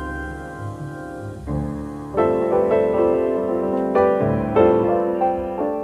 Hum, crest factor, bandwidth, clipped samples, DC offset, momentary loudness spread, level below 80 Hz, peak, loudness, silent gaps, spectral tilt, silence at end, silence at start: none; 16 dB; 11.5 kHz; under 0.1%; under 0.1%; 15 LU; -40 dBFS; -4 dBFS; -20 LUFS; none; -9 dB/octave; 0 s; 0 s